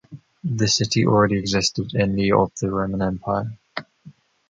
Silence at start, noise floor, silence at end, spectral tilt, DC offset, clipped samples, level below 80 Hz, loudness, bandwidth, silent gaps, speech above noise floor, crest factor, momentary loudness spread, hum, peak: 0.1 s; -48 dBFS; 0.4 s; -5 dB/octave; under 0.1%; under 0.1%; -46 dBFS; -21 LUFS; 9.2 kHz; none; 28 dB; 18 dB; 14 LU; none; -4 dBFS